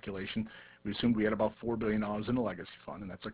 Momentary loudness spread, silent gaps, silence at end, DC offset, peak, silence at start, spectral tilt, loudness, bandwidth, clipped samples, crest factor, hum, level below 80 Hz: 14 LU; none; 0 s; under 0.1%; -16 dBFS; 0.05 s; -5 dB/octave; -34 LUFS; 4 kHz; under 0.1%; 18 dB; none; -58 dBFS